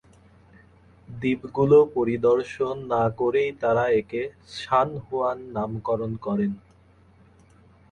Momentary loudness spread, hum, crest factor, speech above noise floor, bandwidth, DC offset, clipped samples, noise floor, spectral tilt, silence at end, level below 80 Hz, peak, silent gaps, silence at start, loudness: 12 LU; none; 18 dB; 32 dB; 9.2 kHz; under 0.1%; under 0.1%; -55 dBFS; -7.5 dB/octave; 1.35 s; -56 dBFS; -6 dBFS; none; 1.1 s; -24 LUFS